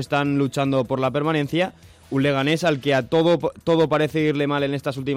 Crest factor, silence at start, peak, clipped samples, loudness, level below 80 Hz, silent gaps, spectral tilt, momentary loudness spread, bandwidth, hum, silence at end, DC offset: 12 dB; 0 s; -10 dBFS; under 0.1%; -21 LUFS; -56 dBFS; none; -6.5 dB/octave; 5 LU; 16 kHz; none; 0 s; under 0.1%